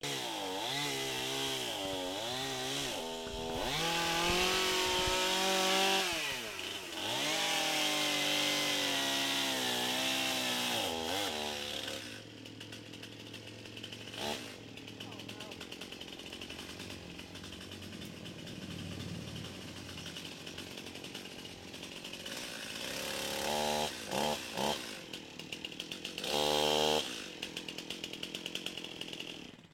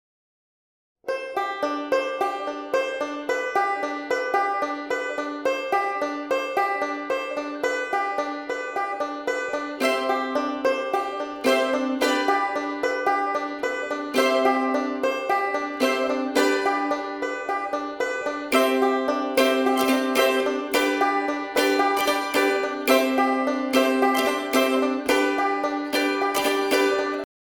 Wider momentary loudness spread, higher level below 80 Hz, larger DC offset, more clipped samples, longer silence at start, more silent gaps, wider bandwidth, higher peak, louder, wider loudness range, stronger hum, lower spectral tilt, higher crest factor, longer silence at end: first, 16 LU vs 7 LU; about the same, -60 dBFS vs -64 dBFS; neither; neither; second, 0 s vs 1.05 s; neither; second, 16.5 kHz vs 19 kHz; second, -16 dBFS vs -4 dBFS; second, -34 LUFS vs -23 LUFS; first, 14 LU vs 5 LU; neither; about the same, -2 dB/octave vs -2 dB/octave; about the same, 20 dB vs 20 dB; second, 0.05 s vs 0.25 s